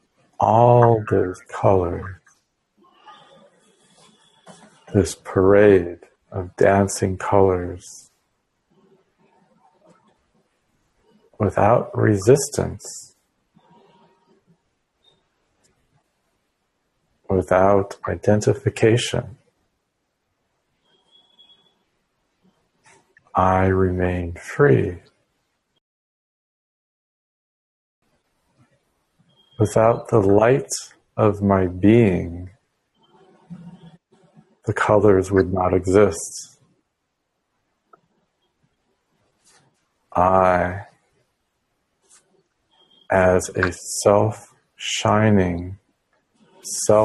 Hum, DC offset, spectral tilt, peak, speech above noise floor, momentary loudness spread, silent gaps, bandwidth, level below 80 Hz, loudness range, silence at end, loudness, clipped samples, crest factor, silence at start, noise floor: none; under 0.1%; -6 dB/octave; 0 dBFS; 57 dB; 18 LU; 25.81-28.02 s; 12.5 kHz; -50 dBFS; 8 LU; 0 s; -19 LUFS; under 0.1%; 22 dB; 0.4 s; -75 dBFS